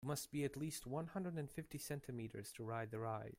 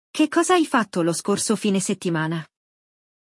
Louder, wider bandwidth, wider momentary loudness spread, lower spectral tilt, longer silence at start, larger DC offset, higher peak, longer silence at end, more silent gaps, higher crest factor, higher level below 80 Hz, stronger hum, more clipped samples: second, -47 LUFS vs -22 LUFS; first, 16 kHz vs 12 kHz; about the same, 6 LU vs 6 LU; about the same, -5.5 dB/octave vs -4.5 dB/octave; second, 0 s vs 0.15 s; neither; second, -30 dBFS vs -6 dBFS; second, 0.05 s vs 0.8 s; neither; about the same, 18 dB vs 18 dB; about the same, -70 dBFS vs -72 dBFS; neither; neither